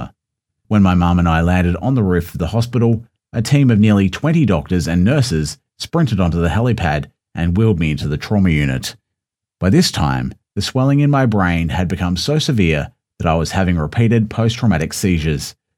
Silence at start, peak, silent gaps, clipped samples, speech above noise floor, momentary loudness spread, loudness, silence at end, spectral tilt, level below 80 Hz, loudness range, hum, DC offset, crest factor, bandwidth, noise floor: 0 s; 0 dBFS; none; under 0.1%; 66 dB; 9 LU; -16 LUFS; 0.25 s; -6.5 dB/octave; -32 dBFS; 2 LU; none; under 0.1%; 16 dB; 16.5 kHz; -81 dBFS